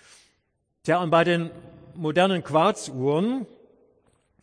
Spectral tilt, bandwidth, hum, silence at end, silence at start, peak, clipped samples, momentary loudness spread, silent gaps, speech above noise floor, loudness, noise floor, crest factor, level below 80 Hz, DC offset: -5.5 dB/octave; 10.5 kHz; none; 1 s; 0.85 s; -6 dBFS; under 0.1%; 14 LU; none; 51 dB; -23 LUFS; -73 dBFS; 18 dB; -68 dBFS; under 0.1%